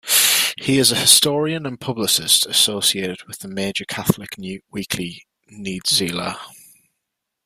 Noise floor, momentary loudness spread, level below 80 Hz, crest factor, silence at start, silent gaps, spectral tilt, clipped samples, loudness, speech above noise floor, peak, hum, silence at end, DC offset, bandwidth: -79 dBFS; 18 LU; -58 dBFS; 20 dB; 0.05 s; none; -2 dB/octave; under 0.1%; -17 LUFS; 59 dB; 0 dBFS; none; 0.9 s; under 0.1%; 16 kHz